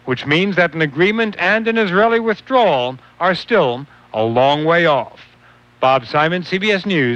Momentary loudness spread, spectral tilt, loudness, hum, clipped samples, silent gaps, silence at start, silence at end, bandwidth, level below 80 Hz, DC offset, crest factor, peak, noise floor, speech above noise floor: 6 LU; -6.5 dB/octave; -16 LUFS; 60 Hz at -50 dBFS; under 0.1%; none; 0.05 s; 0 s; 8.8 kHz; -56 dBFS; under 0.1%; 14 dB; -2 dBFS; -48 dBFS; 33 dB